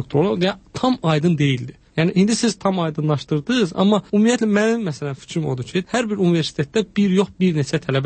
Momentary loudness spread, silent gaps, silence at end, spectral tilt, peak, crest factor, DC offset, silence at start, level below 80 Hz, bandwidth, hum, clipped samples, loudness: 7 LU; none; 0 s; -6 dB/octave; -4 dBFS; 14 dB; under 0.1%; 0 s; -54 dBFS; 8.8 kHz; none; under 0.1%; -20 LUFS